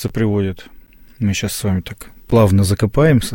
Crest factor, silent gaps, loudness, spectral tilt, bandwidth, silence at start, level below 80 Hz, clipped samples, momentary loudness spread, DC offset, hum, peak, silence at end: 14 dB; none; -17 LUFS; -6 dB/octave; 17 kHz; 0 s; -36 dBFS; under 0.1%; 15 LU; under 0.1%; none; -2 dBFS; 0 s